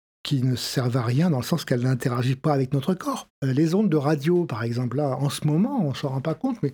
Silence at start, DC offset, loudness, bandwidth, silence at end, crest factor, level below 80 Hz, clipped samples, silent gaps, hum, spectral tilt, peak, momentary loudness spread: 0.25 s; under 0.1%; -24 LUFS; 19.5 kHz; 0 s; 16 dB; -62 dBFS; under 0.1%; 3.30-3.42 s; none; -7 dB/octave; -6 dBFS; 5 LU